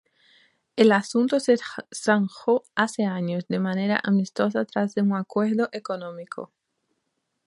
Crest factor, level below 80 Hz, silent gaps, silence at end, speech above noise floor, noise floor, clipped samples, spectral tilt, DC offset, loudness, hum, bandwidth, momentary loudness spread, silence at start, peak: 20 dB; -74 dBFS; none; 1 s; 53 dB; -77 dBFS; under 0.1%; -6 dB/octave; under 0.1%; -24 LUFS; none; 11.5 kHz; 14 LU; 0.75 s; -4 dBFS